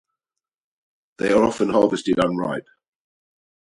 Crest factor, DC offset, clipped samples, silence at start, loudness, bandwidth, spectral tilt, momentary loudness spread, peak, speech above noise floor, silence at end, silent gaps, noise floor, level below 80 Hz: 20 dB; under 0.1%; under 0.1%; 1.2 s; -20 LUFS; 11.5 kHz; -6 dB/octave; 9 LU; -4 dBFS; 68 dB; 1 s; none; -87 dBFS; -56 dBFS